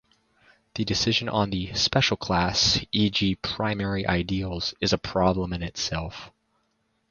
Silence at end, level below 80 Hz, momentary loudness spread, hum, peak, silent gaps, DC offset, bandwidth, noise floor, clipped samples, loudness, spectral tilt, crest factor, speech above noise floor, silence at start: 0.8 s; -44 dBFS; 9 LU; none; -4 dBFS; none; under 0.1%; 7.4 kHz; -72 dBFS; under 0.1%; -25 LUFS; -4 dB/octave; 22 dB; 47 dB; 0.75 s